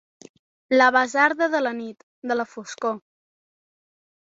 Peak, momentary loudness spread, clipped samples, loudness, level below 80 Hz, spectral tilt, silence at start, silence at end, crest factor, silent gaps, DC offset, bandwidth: -4 dBFS; 18 LU; under 0.1%; -21 LUFS; -74 dBFS; -3 dB/octave; 0.7 s; 1.25 s; 20 dB; 2.03-2.22 s; under 0.1%; 7.8 kHz